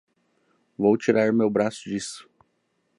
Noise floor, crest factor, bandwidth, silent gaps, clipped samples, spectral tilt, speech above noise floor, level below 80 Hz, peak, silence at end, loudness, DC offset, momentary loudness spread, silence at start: -72 dBFS; 20 dB; 11.5 kHz; none; under 0.1%; -5.5 dB/octave; 49 dB; -66 dBFS; -6 dBFS; 0.75 s; -23 LUFS; under 0.1%; 13 LU; 0.8 s